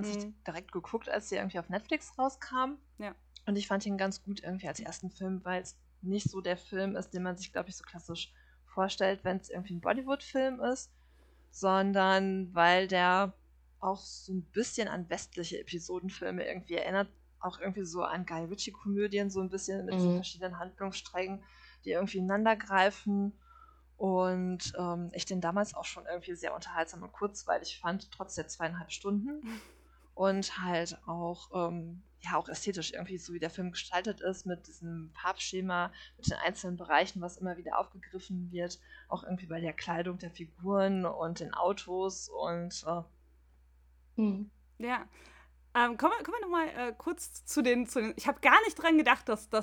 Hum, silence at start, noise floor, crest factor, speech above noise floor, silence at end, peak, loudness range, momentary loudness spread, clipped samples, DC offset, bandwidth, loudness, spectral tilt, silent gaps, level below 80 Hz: none; 0 s; -63 dBFS; 26 dB; 29 dB; 0 s; -8 dBFS; 8 LU; 14 LU; under 0.1%; under 0.1%; 17.5 kHz; -34 LUFS; -4.5 dB/octave; none; -62 dBFS